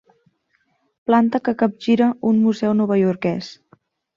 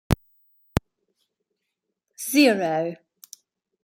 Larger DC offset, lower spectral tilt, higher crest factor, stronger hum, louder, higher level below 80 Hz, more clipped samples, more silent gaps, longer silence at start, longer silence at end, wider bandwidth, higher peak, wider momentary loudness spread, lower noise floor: neither; first, -7.5 dB/octave vs -5 dB/octave; second, 16 dB vs 24 dB; neither; first, -19 LUFS vs -23 LUFS; second, -62 dBFS vs -42 dBFS; neither; neither; first, 1.1 s vs 0.1 s; second, 0.65 s vs 0.9 s; second, 7.2 kHz vs 16.5 kHz; about the same, -4 dBFS vs -2 dBFS; second, 9 LU vs 15 LU; second, -67 dBFS vs -81 dBFS